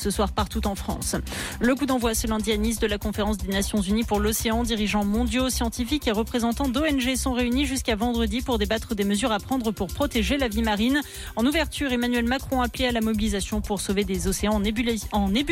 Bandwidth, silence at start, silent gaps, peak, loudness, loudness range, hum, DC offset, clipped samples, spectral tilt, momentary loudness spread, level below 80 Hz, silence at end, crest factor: 17 kHz; 0 s; none; -12 dBFS; -25 LUFS; 1 LU; none; under 0.1%; under 0.1%; -4.5 dB/octave; 4 LU; -34 dBFS; 0 s; 12 dB